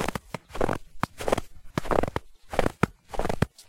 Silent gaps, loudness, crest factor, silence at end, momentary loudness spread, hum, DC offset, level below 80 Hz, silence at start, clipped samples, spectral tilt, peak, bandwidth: none; -30 LUFS; 24 dB; 0.05 s; 8 LU; none; under 0.1%; -38 dBFS; 0 s; under 0.1%; -5.5 dB/octave; -6 dBFS; 16.5 kHz